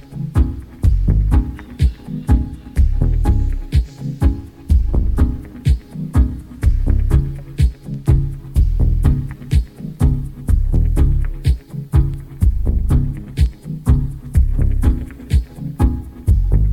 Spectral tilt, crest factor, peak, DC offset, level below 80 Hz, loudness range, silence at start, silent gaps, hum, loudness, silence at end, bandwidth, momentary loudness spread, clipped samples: -8.5 dB/octave; 14 dB; -2 dBFS; under 0.1%; -18 dBFS; 1 LU; 0.1 s; none; none; -19 LUFS; 0 s; 12 kHz; 6 LU; under 0.1%